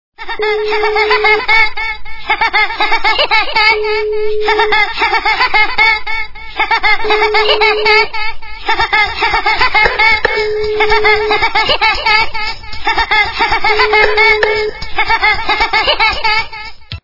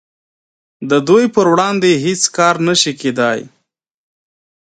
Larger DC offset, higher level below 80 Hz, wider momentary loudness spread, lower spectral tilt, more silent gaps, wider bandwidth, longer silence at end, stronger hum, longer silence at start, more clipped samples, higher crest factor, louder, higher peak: neither; first, -30 dBFS vs -60 dBFS; first, 10 LU vs 6 LU; about the same, -3 dB/octave vs -4 dB/octave; neither; second, 6 kHz vs 9.4 kHz; second, 0.05 s vs 1.25 s; neither; second, 0.2 s vs 0.8 s; first, 0.2% vs under 0.1%; about the same, 12 dB vs 16 dB; about the same, -11 LUFS vs -13 LUFS; about the same, 0 dBFS vs 0 dBFS